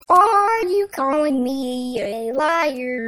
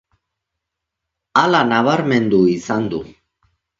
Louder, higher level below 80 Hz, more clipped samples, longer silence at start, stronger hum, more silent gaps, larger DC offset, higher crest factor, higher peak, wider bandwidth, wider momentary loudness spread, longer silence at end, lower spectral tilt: second, -19 LUFS vs -16 LUFS; about the same, -58 dBFS vs -54 dBFS; neither; second, 0.1 s vs 1.35 s; neither; neither; neither; about the same, 16 dB vs 18 dB; about the same, -2 dBFS vs 0 dBFS; first, 16.5 kHz vs 7.6 kHz; first, 10 LU vs 7 LU; second, 0 s vs 0.7 s; second, -4 dB/octave vs -6 dB/octave